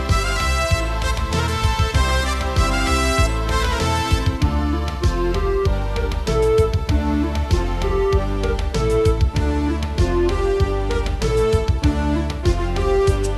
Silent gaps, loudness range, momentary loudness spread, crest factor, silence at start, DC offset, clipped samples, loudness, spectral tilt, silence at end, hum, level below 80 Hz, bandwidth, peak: none; 1 LU; 4 LU; 16 dB; 0 s; under 0.1%; under 0.1%; -20 LUFS; -5.5 dB/octave; 0 s; none; -22 dBFS; 13.5 kHz; -2 dBFS